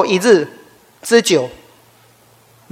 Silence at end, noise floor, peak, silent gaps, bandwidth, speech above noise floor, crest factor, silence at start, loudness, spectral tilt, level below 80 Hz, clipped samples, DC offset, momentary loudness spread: 1.2 s; -50 dBFS; 0 dBFS; none; 16.5 kHz; 36 dB; 18 dB; 0 s; -14 LUFS; -3.5 dB/octave; -60 dBFS; under 0.1%; under 0.1%; 16 LU